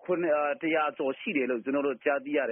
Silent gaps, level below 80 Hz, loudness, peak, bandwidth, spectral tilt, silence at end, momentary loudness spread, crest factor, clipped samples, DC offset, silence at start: none; -78 dBFS; -29 LUFS; -12 dBFS; 3.7 kHz; 0 dB/octave; 0 s; 3 LU; 16 dB; under 0.1%; under 0.1%; 0.05 s